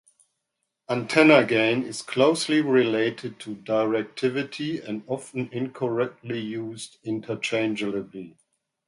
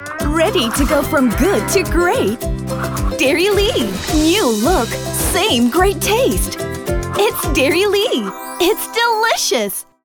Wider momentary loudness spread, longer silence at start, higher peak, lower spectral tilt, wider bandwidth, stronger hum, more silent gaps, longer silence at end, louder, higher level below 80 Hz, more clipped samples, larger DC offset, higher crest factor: first, 15 LU vs 7 LU; first, 0.9 s vs 0 s; about the same, -2 dBFS vs -2 dBFS; about the same, -5 dB/octave vs -4 dB/octave; second, 11.5 kHz vs over 20 kHz; neither; neither; first, 0.6 s vs 0.25 s; second, -24 LUFS vs -16 LUFS; second, -70 dBFS vs -28 dBFS; neither; neither; first, 22 dB vs 14 dB